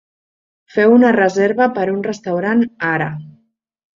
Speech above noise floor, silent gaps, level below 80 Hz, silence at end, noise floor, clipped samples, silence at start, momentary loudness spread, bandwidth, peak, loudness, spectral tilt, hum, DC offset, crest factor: 46 dB; none; -60 dBFS; 0.7 s; -61 dBFS; under 0.1%; 0.75 s; 11 LU; 7.4 kHz; -2 dBFS; -15 LUFS; -7 dB/octave; none; under 0.1%; 14 dB